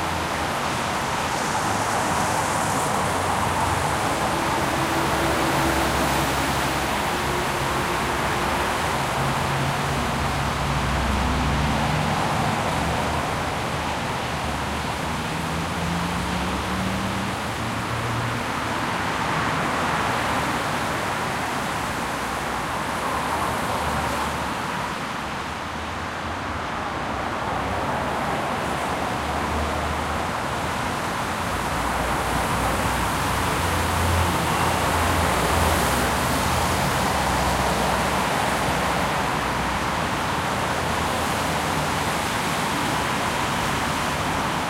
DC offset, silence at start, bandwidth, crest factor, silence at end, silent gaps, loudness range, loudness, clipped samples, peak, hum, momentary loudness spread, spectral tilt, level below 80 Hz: under 0.1%; 0 s; 16 kHz; 16 dB; 0 s; none; 4 LU; -23 LUFS; under 0.1%; -8 dBFS; none; 5 LU; -4 dB/octave; -36 dBFS